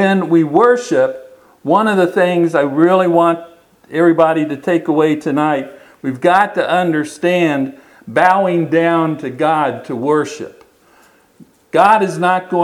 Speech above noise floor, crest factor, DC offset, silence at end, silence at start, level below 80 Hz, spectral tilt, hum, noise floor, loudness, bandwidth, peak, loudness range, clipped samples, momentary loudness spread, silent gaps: 36 dB; 14 dB; under 0.1%; 0 s; 0 s; -64 dBFS; -6.5 dB/octave; none; -50 dBFS; -14 LUFS; 12.5 kHz; 0 dBFS; 3 LU; under 0.1%; 10 LU; none